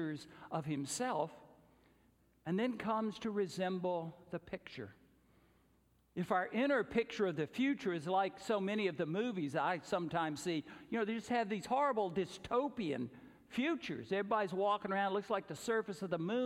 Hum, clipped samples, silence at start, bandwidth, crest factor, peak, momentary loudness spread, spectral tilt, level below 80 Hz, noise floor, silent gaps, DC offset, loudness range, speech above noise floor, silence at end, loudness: none; under 0.1%; 0 s; 16 kHz; 18 dB; -20 dBFS; 10 LU; -5.5 dB/octave; -74 dBFS; -72 dBFS; none; under 0.1%; 4 LU; 35 dB; 0 s; -38 LUFS